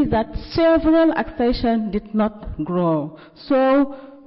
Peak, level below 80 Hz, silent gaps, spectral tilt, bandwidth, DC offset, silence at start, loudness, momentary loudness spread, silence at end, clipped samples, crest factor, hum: -10 dBFS; -36 dBFS; none; -10.5 dB/octave; 5.8 kHz; under 0.1%; 0 s; -19 LUFS; 9 LU; 0.1 s; under 0.1%; 10 dB; none